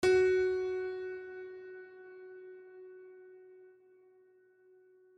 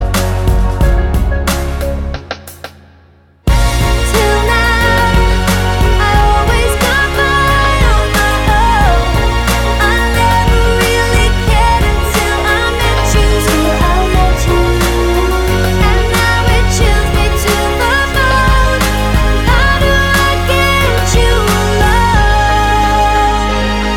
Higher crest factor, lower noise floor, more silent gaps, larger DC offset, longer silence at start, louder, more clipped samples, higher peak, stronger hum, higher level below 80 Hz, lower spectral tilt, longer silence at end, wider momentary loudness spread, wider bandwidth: first, 18 dB vs 10 dB; first, -64 dBFS vs -44 dBFS; neither; neither; about the same, 0 s vs 0 s; second, -33 LUFS vs -11 LUFS; neither; second, -18 dBFS vs 0 dBFS; neither; second, -66 dBFS vs -14 dBFS; about the same, -5 dB/octave vs -4.5 dB/octave; first, 1.55 s vs 0 s; first, 26 LU vs 4 LU; second, 10 kHz vs 17 kHz